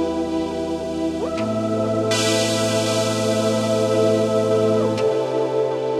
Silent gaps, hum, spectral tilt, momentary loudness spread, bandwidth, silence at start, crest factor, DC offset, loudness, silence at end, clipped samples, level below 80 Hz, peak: none; none; -5 dB/octave; 6 LU; 15 kHz; 0 s; 14 dB; under 0.1%; -20 LUFS; 0 s; under 0.1%; -50 dBFS; -6 dBFS